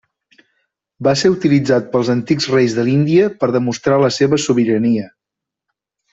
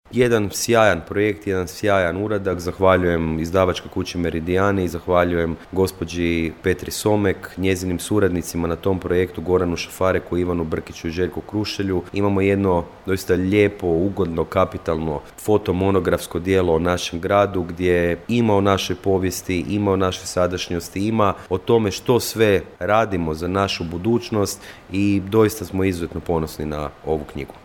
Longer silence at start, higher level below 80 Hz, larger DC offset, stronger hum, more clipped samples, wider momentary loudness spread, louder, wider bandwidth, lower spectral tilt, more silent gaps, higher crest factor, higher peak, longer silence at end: first, 1 s vs 0.1 s; second, -54 dBFS vs -42 dBFS; neither; neither; neither; second, 4 LU vs 7 LU; first, -15 LUFS vs -21 LUFS; second, 8 kHz vs 18 kHz; about the same, -6 dB/octave vs -5.5 dB/octave; neither; about the same, 14 dB vs 18 dB; about the same, -2 dBFS vs -2 dBFS; first, 1.05 s vs 0.05 s